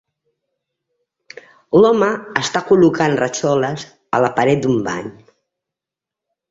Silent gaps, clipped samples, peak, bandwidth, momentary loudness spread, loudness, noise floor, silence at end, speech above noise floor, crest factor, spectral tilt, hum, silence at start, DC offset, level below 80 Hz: none; under 0.1%; -2 dBFS; 8 kHz; 11 LU; -16 LUFS; -86 dBFS; 1.4 s; 71 dB; 16 dB; -5.5 dB/octave; none; 1.7 s; under 0.1%; -56 dBFS